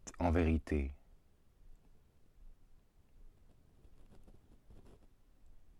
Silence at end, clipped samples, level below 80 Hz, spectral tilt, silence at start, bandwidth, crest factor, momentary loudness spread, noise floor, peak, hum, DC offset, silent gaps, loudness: 0.2 s; under 0.1%; -48 dBFS; -7.5 dB/octave; 0.05 s; 11 kHz; 22 dB; 15 LU; -65 dBFS; -20 dBFS; none; under 0.1%; none; -36 LUFS